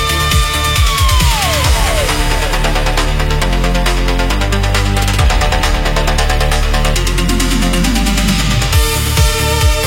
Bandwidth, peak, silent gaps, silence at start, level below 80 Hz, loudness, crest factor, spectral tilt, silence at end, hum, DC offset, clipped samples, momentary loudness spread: 17 kHz; 0 dBFS; none; 0 s; -14 dBFS; -13 LUFS; 12 dB; -4 dB/octave; 0 s; none; under 0.1%; under 0.1%; 3 LU